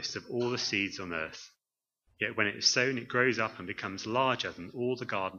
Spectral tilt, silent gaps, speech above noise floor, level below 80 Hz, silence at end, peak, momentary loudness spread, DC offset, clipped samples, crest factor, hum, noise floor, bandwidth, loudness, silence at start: -3 dB/octave; none; over 58 dB; -70 dBFS; 0 s; -12 dBFS; 11 LU; under 0.1%; under 0.1%; 20 dB; none; under -90 dBFS; 7.4 kHz; -31 LUFS; 0 s